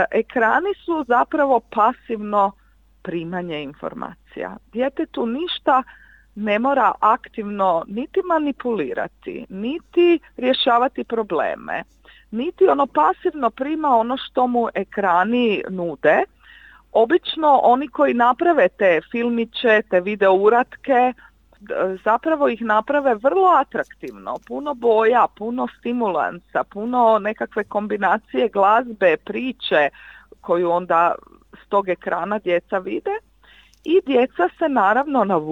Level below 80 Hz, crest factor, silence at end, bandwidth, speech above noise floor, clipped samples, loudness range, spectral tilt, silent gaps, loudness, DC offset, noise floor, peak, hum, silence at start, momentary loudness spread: -56 dBFS; 18 dB; 0 s; 7.6 kHz; 32 dB; under 0.1%; 5 LU; -7 dB/octave; none; -19 LUFS; under 0.1%; -51 dBFS; -2 dBFS; none; 0 s; 12 LU